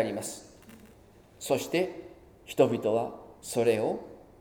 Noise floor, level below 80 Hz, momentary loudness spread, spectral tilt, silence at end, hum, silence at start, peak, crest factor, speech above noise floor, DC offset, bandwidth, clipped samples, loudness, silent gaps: -56 dBFS; -64 dBFS; 19 LU; -5 dB/octave; 0.2 s; none; 0 s; -10 dBFS; 22 dB; 27 dB; under 0.1%; 19.5 kHz; under 0.1%; -29 LUFS; none